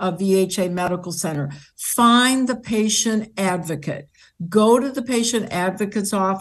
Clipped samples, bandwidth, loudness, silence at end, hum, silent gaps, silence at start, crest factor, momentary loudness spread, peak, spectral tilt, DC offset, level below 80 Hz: under 0.1%; 12.5 kHz; -20 LUFS; 0 s; none; none; 0 s; 18 dB; 13 LU; -2 dBFS; -4 dB/octave; under 0.1%; -58 dBFS